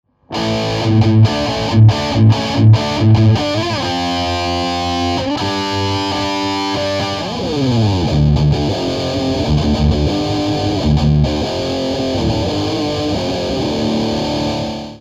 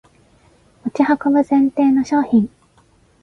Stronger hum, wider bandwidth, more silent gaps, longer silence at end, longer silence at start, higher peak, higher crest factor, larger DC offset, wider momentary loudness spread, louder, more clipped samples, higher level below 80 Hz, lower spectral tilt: neither; first, 9 kHz vs 7 kHz; neither; second, 0.05 s vs 0.75 s; second, 0.3 s vs 0.85 s; first, 0 dBFS vs -4 dBFS; about the same, 14 dB vs 14 dB; neither; second, 7 LU vs 12 LU; about the same, -15 LUFS vs -16 LUFS; neither; first, -28 dBFS vs -56 dBFS; about the same, -6.5 dB/octave vs -7 dB/octave